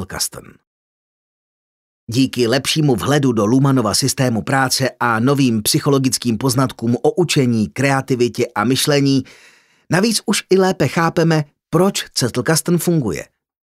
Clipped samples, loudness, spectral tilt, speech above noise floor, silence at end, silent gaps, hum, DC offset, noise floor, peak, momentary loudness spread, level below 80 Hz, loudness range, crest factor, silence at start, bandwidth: under 0.1%; -16 LUFS; -4.5 dB/octave; over 74 dB; 0.5 s; 0.67-2.07 s; none; under 0.1%; under -90 dBFS; -2 dBFS; 5 LU; -52 dBFS; 2 LU; 16 dB; 0 s; 16 kHz